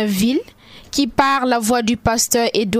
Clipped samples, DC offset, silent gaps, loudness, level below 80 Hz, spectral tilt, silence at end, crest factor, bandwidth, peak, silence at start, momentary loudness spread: under 0.1%; under 0.1%; none; -17 LUFS; -42 dBFS; -3.5 dB/octave; 0 s; 18 dB; 16 kHz; 0 dBFS; 0 s; 5 LU